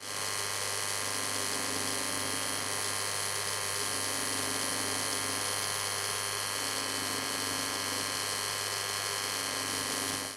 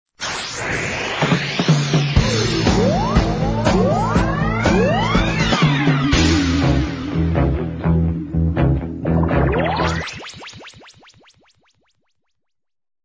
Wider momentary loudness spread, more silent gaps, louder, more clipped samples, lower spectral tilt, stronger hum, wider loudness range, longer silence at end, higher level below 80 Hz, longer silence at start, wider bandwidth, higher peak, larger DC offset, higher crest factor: second, 1 LU vs 7 LU; neither; second, -31 LUFS vs -18 LUFS; neither; second, -1 dB/octave vs -5.5 dB/octave; neither; second, 1 LU vs 6 LU; second, 0 s vs 2.25 s; second, -70 dBFS vs -28 dBFS; second, 0 s vs 0.2 s; first, 16 kHz vs 8 kHz; second, -18 dBFS vs -2 dBFS; neither; about the same, 16 dB vs 16 dB